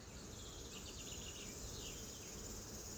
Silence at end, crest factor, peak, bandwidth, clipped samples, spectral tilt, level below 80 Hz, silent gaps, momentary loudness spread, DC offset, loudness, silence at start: 0 s; 16 dB; -36 dBFS; over 20 kHz; under 0.1%; -2.5 dB/octave; -58 dBFS; none; 3 LU; under 0.1%; -49 LUFS; 0 s